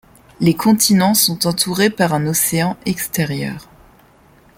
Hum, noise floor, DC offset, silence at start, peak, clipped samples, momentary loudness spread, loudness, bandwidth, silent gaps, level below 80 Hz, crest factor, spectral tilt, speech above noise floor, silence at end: none; -49 dBFS; under 0.1%; 0.4 s; 0 dBFS; under 0.1%; 9 LU; -16 LUFS; 17 kHz; none; -50 dBFS; 16 dB; -4 dB/octave; 33 dB; 0.95 s